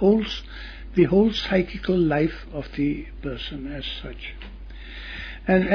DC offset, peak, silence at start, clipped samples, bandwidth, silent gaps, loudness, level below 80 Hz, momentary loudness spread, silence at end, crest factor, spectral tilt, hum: under 0.1%; -6 dBFS; 0 s; under 0.1%; 5.4 kHz; none; -24 LUFS; -38 dBFS; 18 LU; 0 s; 18 dB; -7.5 dB/octave; none